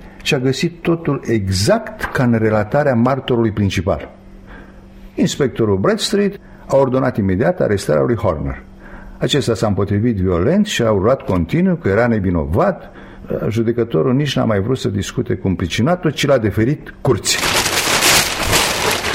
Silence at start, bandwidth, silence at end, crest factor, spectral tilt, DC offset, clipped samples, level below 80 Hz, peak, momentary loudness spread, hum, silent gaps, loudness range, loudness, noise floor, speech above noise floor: 0 s; 16.5 kHz; 0 s; 16 dB; -4.5 dB/octave; under 0.1%; under 0.1%; -38 dBFS; 0 dBFS; 6 LU; none; none; 4 LU; -16 LUFS; -38 dBFS; 22 dB